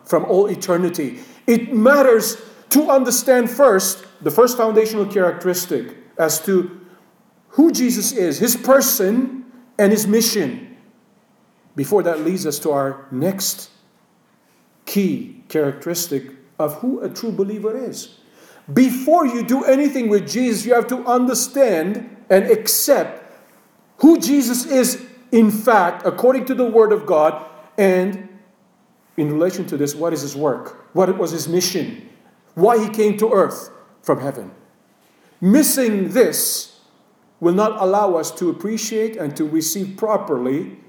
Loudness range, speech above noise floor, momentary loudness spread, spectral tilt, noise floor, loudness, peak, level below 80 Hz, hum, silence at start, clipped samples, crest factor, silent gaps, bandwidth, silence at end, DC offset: 7 LU; 41 dB; 12 LU; -4.5 dB/octave; -57 dBFS; -17 LUFS; -2 dBFS; -72 dBFS; none; 0.1 s; under 0.1%; 16 dB; none; over 20 kHz; 0.15 s; under 0.1%